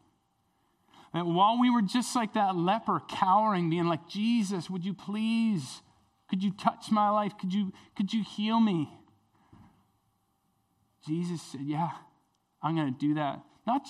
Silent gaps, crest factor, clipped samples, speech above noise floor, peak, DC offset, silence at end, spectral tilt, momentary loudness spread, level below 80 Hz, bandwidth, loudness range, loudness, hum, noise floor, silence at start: none; 20 dB; under 0.1%; 45 dB; -10 dBFS; under 0.1%; 0 s; -6 dB/octave; 11 LU; -76 dBFS; 12.5 kHz; 10 LU; -29 LUFS; none; -74 dBFS; 1.15 s